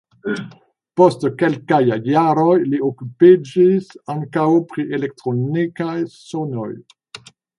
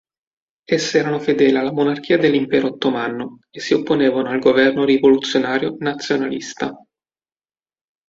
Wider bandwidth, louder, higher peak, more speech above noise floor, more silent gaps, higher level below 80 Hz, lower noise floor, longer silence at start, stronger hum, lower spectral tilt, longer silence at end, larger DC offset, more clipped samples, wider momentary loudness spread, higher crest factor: first, 10.5 kHz vs 7.8 kHz; about the same, -18 LUFS vs -18 LUFS; about the same, 0 dBFS vs -2 dBFS; second, 25 dB vs over 73 dB; neither; about the same, -64 dBFS vs -60 dBFS; second, -42 dBFS vs under -90 dBFS; second, 0.25 s vs 0.7 s; neither; first, -8 dB/octave vs -5 dB/octave; second, 0.4 s vs 1.35 s; neither; neither; first, 14 LU vs 11 LU; about the same, 18 dB vs 16 dB